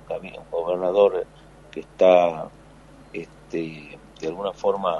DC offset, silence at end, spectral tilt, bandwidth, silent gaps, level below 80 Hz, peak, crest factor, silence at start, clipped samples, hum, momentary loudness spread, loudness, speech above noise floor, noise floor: under 0.1%; 0 s; -6 dB/octave; 10.5 kHz; none; -54 dBFS; -4 dBFS; 20 dB; 0.1 s; under 0.1%; none; 21 LU; -22 LUFS; 26 dB; -48 dBFS